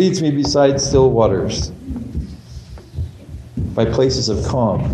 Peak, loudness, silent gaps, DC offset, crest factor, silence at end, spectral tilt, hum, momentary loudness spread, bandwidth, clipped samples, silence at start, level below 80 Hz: 0 dBFS; -17 LUFS; none; under 0.1%; 16 dB; 0 s; -5.5 dB/octave; none; 19 LU; 10.5 kHz; under 0.1%; 0 s; -32 dBFS